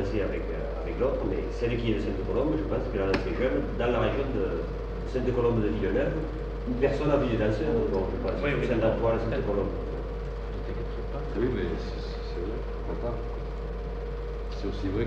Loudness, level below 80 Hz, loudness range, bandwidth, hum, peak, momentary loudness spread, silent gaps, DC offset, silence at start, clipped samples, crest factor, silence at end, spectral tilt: -30 LUFS; -34 dBFS; 6 LU; 7.2 kHz; none; -10 dBFS; 10 LU; none; under 0.1%; 0 s; under 0.1%; 18 dB; 0 s; -8 dB/octave